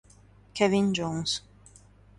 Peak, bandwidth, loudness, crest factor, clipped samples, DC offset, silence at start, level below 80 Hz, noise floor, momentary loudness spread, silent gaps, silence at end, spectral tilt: -8 dBFS; 11.5 kHz; -27 LUFS; 22 dB; under 0.1%; under 0.1%; 0.55 s; -58 dBFS; -56 dBFS; 9 LU; none; 0.8 s; -4.5 dB/octave